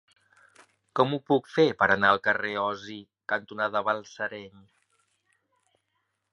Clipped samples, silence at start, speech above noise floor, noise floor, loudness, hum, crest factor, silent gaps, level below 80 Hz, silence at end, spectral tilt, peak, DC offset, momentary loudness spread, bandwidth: under 0.1%; 0.95 s; 51 dB; -78 dBFS; -26 LUFS; none; 24 dB; none; -66 dBFS; 1.85 s; -5.5 dB/octave; -6 dBFS; under 0.1%; 14 LU; 11 kHz